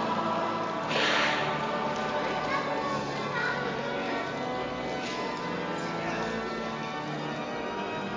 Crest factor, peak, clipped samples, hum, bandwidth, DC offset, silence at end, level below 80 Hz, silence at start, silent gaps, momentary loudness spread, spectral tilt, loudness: 16 dB; -14 dBFS; under 0.1%; none; 7.6 kHz; under 0.1%; 0 s; -58 dBFS; 0 s; none; 7 LU; -4.5 dB/octave; -30 LUFS